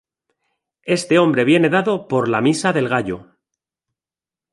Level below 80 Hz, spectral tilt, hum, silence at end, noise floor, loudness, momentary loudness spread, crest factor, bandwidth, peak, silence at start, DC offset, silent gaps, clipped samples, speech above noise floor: -58 dBFS; -5.5 dB/octave; none; 1.3 s; under -90 dBFS; -17 LUFS; 10 LU; 18 dB; 11.5 kHz; -2 dBFS; 0.85 s; under 0.1%; none; under 0.1%; over 73 dB